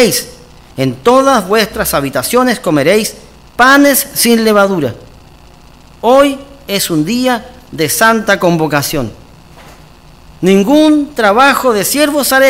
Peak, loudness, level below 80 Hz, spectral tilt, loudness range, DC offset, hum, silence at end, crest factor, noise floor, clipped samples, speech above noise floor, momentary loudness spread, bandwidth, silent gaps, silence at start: 0 dBFS; -10 LUFS; -40 dBFS; -4 dB/octave; 4 LU; under 0.1%; none; 0 s; 12 dB; -38 dBFS; 1%; 28 dB; 11 LU; 18 kHz; none; 0 s